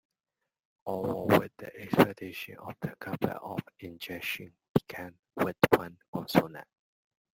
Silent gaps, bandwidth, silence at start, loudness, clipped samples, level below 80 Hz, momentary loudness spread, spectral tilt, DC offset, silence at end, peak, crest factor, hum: 4.69-4.75 s, 5.19-5.23 s, 6.08-6.13 s; 16.5 kHz; 0.85 s; -31 LUFS; under 0.1%; -64 dBFS; 17 LU; -6.5 dB/octave; under 0.1%; 0.7 s; -4 dBFS; 28 dB; none